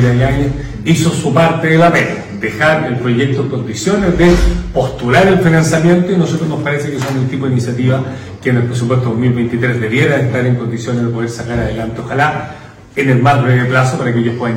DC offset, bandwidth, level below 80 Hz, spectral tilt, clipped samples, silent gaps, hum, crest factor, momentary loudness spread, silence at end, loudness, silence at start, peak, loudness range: under 0.1%; 16 kHz; -28 dBFS; -6.5 dB/octave; under 0.1%; none; none; 10 dB; 9 LU; 0 s; -13 LUFS; 0 s; -2 dBFS; 4 LU